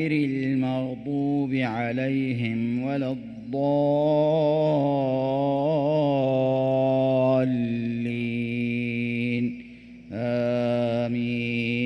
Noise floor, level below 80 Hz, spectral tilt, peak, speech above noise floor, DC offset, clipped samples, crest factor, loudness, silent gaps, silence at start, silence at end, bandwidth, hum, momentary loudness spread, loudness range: -44 dBFS; -60 dBFS; -9 dB/octave; -12 dBFS; 20 dB; under 0.1%; under 0.1%; 12 dB; -25 LUFS; none; 0 s; 0 s; 6 kHz; none; 7 LU; 4 LU